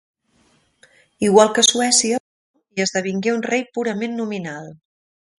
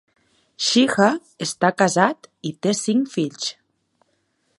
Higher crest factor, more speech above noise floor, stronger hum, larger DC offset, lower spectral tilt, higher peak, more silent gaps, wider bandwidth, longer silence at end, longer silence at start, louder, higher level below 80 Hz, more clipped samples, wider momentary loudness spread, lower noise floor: about the same, 20 dB vs 22 dB; second, 42 dB vs 48 dB; neither; neither; second, -2.5 dB/octave vs -4 dB/octave; about the same, 0 dBFS vs 0 dBFS; first, 2.20-2.54 s vs none; about the same, 11.5 kHz vs 11.5 kHz; second, 0.65 s vs 1.05 s; first, 1.2 s vs 0.6 s; about the same, -18 LUFS vs -20 LUFS; first, -64 dBFS vs -70 dBFS; neither; about the same, 14 LU vs 12 LU; second, -60 dBFS vs -68 dBFS